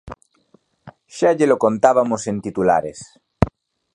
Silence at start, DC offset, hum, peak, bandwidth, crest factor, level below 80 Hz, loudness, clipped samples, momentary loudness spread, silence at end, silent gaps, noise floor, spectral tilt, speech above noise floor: 0.05 s; under 0.1%; none; 0 dBFS; 11 kHz; 20 dB; -40 dBFS; -18 LUFS; under 0.1%; 14 LU; 0.45 s; none; -58 dBFS; -6.5 dB/octave; 41 dB